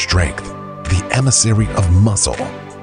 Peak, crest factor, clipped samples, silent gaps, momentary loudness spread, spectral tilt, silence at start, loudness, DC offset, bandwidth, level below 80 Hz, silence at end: 0 dBFS; 16 dB; under 0.1%; none; 15 LU; -4 dB/octave; 0 s; -15 LUFS; under 0.1%; 10.5 kHz; -28 dBFS; 0 s